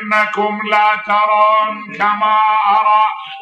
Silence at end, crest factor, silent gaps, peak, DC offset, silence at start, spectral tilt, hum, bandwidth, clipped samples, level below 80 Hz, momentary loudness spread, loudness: 0 s; 12 dB; none; -2 dBFS; under 0.1%; 0 s; -4.5 dB/octave; none; 8.8 kHz; under 0.1%; -68 dBFS; 6 LU; -13 LUFS